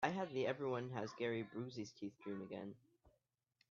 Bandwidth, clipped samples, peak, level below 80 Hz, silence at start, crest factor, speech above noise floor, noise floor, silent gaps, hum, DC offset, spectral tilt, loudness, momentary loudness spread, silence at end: 7.2 kHz; under 0.1%; -24 dBFS; -82 dBFS; 0 s; 22 dB; 40 dB; -84 dBFS; none; none; under 0.1%; -5 dB/octave; -45 LUFS; 10 LU; 0.65 s